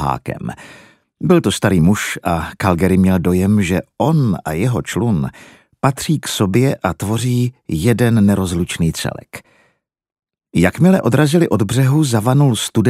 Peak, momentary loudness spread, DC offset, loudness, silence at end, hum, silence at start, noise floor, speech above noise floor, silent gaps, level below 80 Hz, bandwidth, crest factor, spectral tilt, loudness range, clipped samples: 0 dBFS; 10 LU; under 0.1%; -16 LUFS; 0 s; none; 0 s; -62 dBFS; 47 dB; none; -40 dBFS; 15.5 kHz; 16 dB; -6 dB/octave; 3 LU; under 0.1%